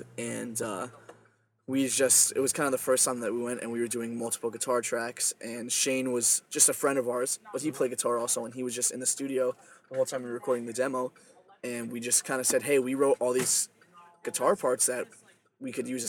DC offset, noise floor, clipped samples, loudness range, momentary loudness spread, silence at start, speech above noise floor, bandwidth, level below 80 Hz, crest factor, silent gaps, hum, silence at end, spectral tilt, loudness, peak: under 0.1%; -65 dBFS; under 0.1%; 4 LU; 13 LU; 0 s; 36 dB; 19 kHz; -80 dBFS; 24 dB; none; none; 0 s; -2 dB/octave; -28 LUFS; -6 dBFS